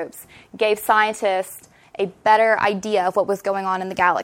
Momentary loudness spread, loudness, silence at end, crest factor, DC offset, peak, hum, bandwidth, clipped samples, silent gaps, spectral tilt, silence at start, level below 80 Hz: 13 LU; -20 LUFS; 0 s; 18 dB; under 0.1%; -2 dBFS; none; 16.5 kHz; under 0.1%; none; -4 dB/octave; 0 s; -62 dBFS